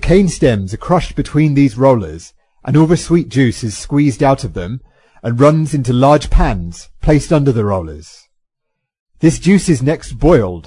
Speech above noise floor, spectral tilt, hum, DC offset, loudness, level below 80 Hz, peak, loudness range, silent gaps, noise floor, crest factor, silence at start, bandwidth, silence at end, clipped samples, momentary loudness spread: 61 dB; -7 dB/octave; none; under 0.1%; -13 LUFS; -26 dBFS; 0 dBFS; 2 LU; 9.00-9.06 s; -73 dBFS; 14 dB; 0 s; 11 kHz; 0.05 s; under 0.1%; 14 LU